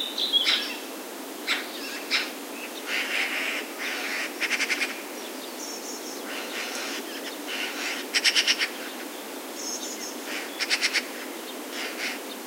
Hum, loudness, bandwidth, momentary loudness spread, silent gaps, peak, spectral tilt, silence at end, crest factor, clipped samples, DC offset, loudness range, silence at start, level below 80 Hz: none; -27 LUFS; 16 kHz; 14 LU; none; -6 dBFS; 1 dB/octave; 0 s; 24 dB; under 0.1%; under 0.1%; 3 LU; 0 s; under -90 dBFS